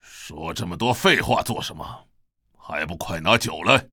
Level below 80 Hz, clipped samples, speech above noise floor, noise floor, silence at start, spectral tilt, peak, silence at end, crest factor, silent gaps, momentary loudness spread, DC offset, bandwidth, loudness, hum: -48 dBFS; under 0.1%; 38 dB; -60 dBFS; 0.1 s; -4 dB/octave; -2 dBFS; 0.1 s; 22 dB; none; 16 LU; under 0.1%; over 20 kHz; -22 LUFS; none